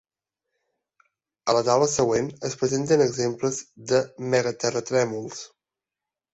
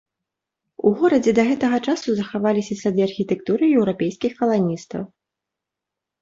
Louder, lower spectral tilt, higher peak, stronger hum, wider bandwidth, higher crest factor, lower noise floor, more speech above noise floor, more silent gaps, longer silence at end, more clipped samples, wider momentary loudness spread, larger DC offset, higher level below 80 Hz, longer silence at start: second, -24 LUFS vs -20 LUFS; second, -4.5 dB/octave vs -6.5 dB/octave; about the same, -6 dBFS vs -4 dBFS; neither; about the same, 8.2 kHz vs 7.8 kHz; about the same, 18 dB vs 18 dB; first, -89 dBFS vs -85 dBFS; about the same, 65 dB vs 66 dB; neither; second, 0.85 s vs 1.15 s; neither; first, 12 LU vs 7 LU; neither; about the same, -62 dBFS vs -60 dBFS; first, 1.45 s vs 0.85 s